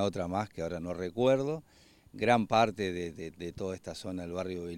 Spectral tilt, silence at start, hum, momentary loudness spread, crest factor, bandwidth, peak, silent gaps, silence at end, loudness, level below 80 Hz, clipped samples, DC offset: -6 dB/octave; 0 s; none; 13 LU; 22 dB; 16.5 kHz; -10 dBFS; none; 0 s; -32 LUFS; -62 dBFS; under 0.1%; under 0.1%